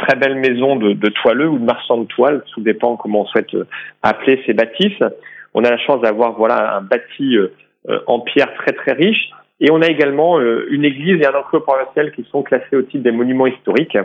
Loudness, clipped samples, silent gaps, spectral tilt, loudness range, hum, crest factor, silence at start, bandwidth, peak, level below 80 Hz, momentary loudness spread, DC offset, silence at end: -15 LUFS; under 0.1%; none; -7.5 dB/octave; 2 LU; none; 14 dB; 0 s; 7 kHz; 0 dBFS; -64 dBFS; 6 LU; under 0.1%; 0 s